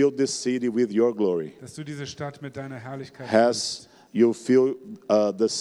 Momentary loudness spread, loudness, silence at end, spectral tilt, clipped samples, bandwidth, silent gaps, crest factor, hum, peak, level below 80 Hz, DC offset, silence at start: 16 LU; -24 LUFS; 0 s; -4.5 dB/octave; under 0.1%; 12 kHz; none; 18 dB; none; -6 dBFS; -70 dBFS; under 0.1%; 0 s